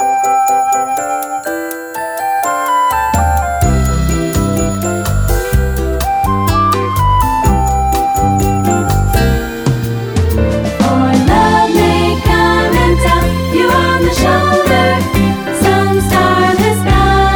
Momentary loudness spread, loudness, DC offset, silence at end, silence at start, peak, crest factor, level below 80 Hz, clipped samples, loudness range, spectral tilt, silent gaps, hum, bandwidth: 6 LU; -12 LUFS; under 0.1%; 0 s; 0 s; 0 dBFS; 12 dB; -20 dBFS; under 0.1%; 3 LU; -5.5 dB/octave; none; none; over 20 kHz